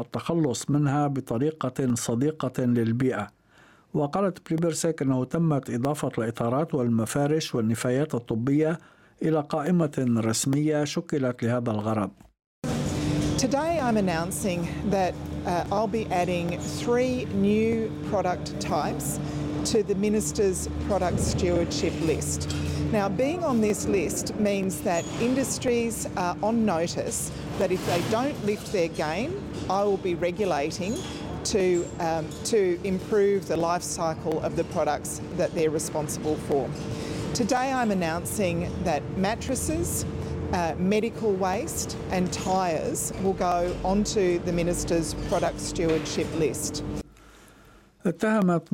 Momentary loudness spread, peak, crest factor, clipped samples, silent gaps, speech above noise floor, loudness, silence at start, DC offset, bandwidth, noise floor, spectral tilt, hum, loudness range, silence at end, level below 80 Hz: 5 LU; -12 dBFS; 14 dB; under 0.1%; 12.46-12.62 s; 31 dB; -26 LUFS; 0 s; under 0.1%; 16.5 kHz; -56 dBFS; -5.5 dB/octave; none; 2 LU; 0.05 s; -46 dBFS